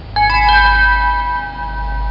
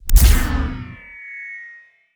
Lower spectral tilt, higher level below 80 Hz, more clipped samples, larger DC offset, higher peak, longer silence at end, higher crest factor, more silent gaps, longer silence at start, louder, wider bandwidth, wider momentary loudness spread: about the same, -5 dB/octave vs -4 dB/octave; about the same, -20 dBFS vs -18 dBFS; neither; neither; about the same, -2 dBFS vs 0 dBFS; second, 0 s vs 0.5 s; about the same, 12 dB vs 16 dB; neither; about the same, 0 s vs 0.05 s; first, -13 LUFS vs -19 LUFS; second, 5.8 kHz vs over 20 kHz; second, 13 LU vs 21 LU